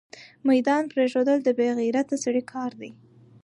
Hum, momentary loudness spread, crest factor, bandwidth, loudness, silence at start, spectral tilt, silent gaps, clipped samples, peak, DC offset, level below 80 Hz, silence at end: none; 12 LU; 14 dB; 11 kHz; -24 LUFS; 0.15 s; -4.5 dB/octave; none; under 0.1%; -10 dBFS; under 0.1%; -76 dBFS; 0.5 s